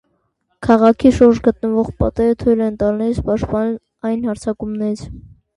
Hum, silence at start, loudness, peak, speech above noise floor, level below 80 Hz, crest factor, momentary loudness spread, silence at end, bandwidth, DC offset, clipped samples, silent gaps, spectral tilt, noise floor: none; 0.6 s; -16 LUFS; 0 dBFS; 51 dB; -36 dBFS; 16 dB; 12 LU; 0.3 s; 11 kHz; under 0.1%; under 0.1%; none; -7.5 dB/octave; -66 dBFS